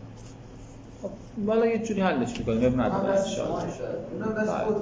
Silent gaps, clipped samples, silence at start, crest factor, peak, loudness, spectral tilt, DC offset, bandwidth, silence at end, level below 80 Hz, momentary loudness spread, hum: none; under 0.1%; 0 s; 16 dB; -10 dBFS; -27 LUFS; -6.5 dB/octave; under 0.1%; 8 kHz; 0 s; -48 dBFS; 21 LU; none